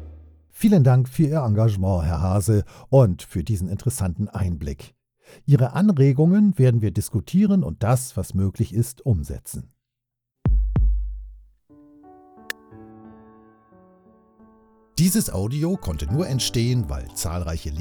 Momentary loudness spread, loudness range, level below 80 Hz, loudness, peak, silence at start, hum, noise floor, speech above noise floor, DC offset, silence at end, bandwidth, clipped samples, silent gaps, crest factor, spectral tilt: 14 LU; 11 LU; -32 dBFS; -21 LUFS; -4 dBFS; 0 s; none; -83 dBFS; 63 dB; under 0.1%; 0 s; over 20 kHz; under 0.1%; none; 18 dB; -7 dB/octave